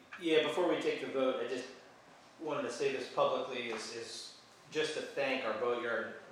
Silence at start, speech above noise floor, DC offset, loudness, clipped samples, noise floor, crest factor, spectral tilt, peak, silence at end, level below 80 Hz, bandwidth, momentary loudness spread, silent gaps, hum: 0 s; 24 dB; under 0.1%; -36 LUFS; under 0.1%; -59 dBFS; 20 dB; -3.5 dB/octave; -16 dBFS; 0 s; -86 dBFS; 14 kHz; 13 LU; none; none